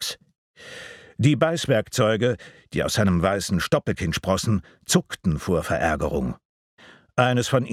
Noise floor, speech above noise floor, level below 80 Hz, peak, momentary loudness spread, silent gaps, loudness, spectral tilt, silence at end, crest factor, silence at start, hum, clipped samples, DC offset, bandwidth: -42 dBFS; 19 dB; -44 dBFS; -2 dBFS; 14 LU; 0.38-0.54 s, 6.45-6.77 s; -23 LUFS; -5 dB/octave; 0 s; 20 dB; 0 s; none; under 0.1%; under 0.1%; 16 kHz